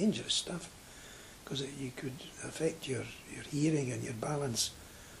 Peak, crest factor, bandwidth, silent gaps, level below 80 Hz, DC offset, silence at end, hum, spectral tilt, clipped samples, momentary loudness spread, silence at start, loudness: -18 dBFS; 18 dB; 15.5 kHz; none; -62 dBFS; under 0.1%; 0 s; none; -4 dB/octave; under 0.1%; 18 LU; 0 s; -36 LUFS